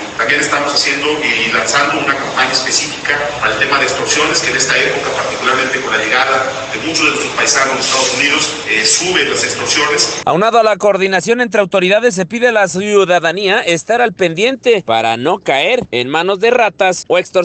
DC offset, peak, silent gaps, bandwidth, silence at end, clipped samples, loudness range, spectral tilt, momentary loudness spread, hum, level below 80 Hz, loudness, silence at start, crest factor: under 0.1%; 0 dBFS; none; 9.4 kHz; 0 s; under 0.1%; 1 LU; -2 dB/octave; 4 LU; none; -50 dBFS; -12 LUFS; 0 s; 12 dB